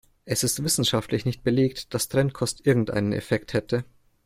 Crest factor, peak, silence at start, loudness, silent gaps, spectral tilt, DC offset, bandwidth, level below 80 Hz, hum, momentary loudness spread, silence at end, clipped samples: 16 dB; -8 dBFS; 0.25 s; -25 LUFS; none; -4.5 dB/octave; under 0.1%; 16 kHz; -52 dBFS; none; 6 LU; 0.4 s; under 0.1%